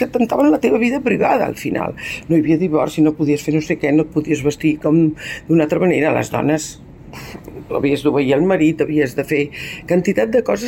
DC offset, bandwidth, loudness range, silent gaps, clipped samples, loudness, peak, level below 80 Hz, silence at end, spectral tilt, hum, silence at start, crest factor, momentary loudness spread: under 0.1%; 16.5 kHz; 2 LU; none; under 0.1%; -17 LUFS; -4 dBFS; -46 dBFS; 0 s; -6.5 dB/octave; none; 0 s; 12 dB; 10 LU